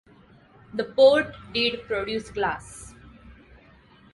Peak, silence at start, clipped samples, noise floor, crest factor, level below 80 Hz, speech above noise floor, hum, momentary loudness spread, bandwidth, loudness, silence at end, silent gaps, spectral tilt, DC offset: -6 dBFS; 0.75 s; under 0.1%; -54 dBFS; 20 dB; -54 dBFS; 31 dB; none; 22 LU; 11.5 kHz; -24 LUFS; 0.8 s; none; -4 dB/octave; under 0.1%